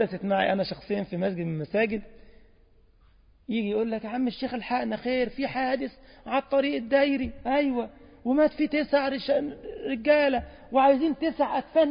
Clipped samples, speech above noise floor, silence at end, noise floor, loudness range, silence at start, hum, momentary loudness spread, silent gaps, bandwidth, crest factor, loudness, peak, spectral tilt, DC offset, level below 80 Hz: under 0.1%; 32 dB; 0 s; -58 dBFS; 6 LU; 0 s; none; 10 LU; none; 5.4 kHz; 16 dB; -27 LUFS; -10 dBFS; -10 dB/octave; under 0.1%; -54 dBFS